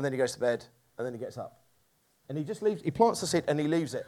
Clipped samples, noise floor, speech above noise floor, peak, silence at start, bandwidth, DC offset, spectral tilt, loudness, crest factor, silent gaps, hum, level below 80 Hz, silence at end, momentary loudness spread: under 0.1%; -70 dBFS; 40 dB; -8 dBFS; 0 s; 15.5 kHz; under 0.1%; -5 dB/octave; -30 LUFS; 22 dB; none; none; -68 dBFS; 0 s; 14 LU